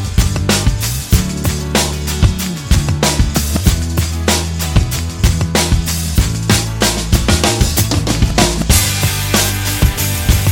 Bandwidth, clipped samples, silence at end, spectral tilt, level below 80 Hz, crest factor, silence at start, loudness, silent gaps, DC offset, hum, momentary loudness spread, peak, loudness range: 17 kHz; under 0.1%; 0 s; -4 dB/octave; -18 dBFS; 14 dB; 0 s; -14 LUFS; none; under 0.1%; none; 4 LU; 0 dBFS; 2 LU